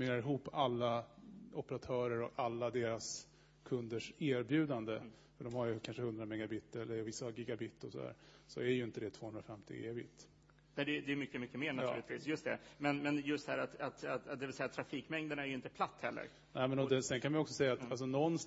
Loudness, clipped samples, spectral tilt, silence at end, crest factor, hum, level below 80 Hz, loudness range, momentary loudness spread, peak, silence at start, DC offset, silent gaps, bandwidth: -41 LUFS; under 0.1%; -4.5 dB/octave; 0 s; 20 dB; none; -74 dBFS; 5 LU; 12 LU; -20 dBFS; 0 s; under 0.1%; none; 7.6 kHz